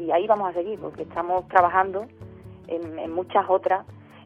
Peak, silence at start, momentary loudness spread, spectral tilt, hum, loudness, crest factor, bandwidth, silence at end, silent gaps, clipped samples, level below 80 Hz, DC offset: -4 dBFS; 0 s; 16 LU; -7.5 dB/octave; none; -24 LUFS; 22 dB; 6.2 kHz; 0 s; none; under 0.1%; -58 dBFS; under 0.1%